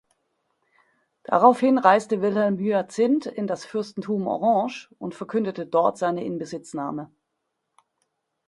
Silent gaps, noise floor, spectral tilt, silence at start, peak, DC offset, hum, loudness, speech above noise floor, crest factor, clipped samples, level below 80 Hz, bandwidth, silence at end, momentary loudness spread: none; -79 dBFS; -6.5 dB/octave; 1.3 s; -2 dBFS; under 0.1%; none; -23 LUFS; 56 dB; 22 dB; under 0.1%; -72 dBFS; 11.5 kHz; 1.45 s; 14 LU